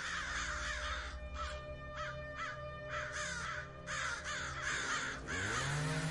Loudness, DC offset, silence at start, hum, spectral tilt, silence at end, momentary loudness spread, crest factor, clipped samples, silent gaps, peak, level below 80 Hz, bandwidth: -40 LUFS; under 0.1%; 0 s; none; -3 dB/octave; 0 s; 8 LU; 14 dB; under 0.1%; none; -26 dBFS; -52 dBFS; 11.5 kHz